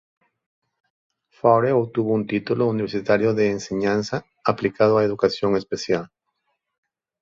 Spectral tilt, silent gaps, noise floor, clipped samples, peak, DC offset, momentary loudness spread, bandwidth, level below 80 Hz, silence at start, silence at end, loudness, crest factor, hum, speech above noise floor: -6.5 dB/octave; none; -74 dBFS; under 0.1%; -2 dBFS; under 0.1%; 7 LU; 7.6 kHz; -58 dBFS; 1.45 s; 1.15 s; -21 LUFS; 20 dB; none; 54 dB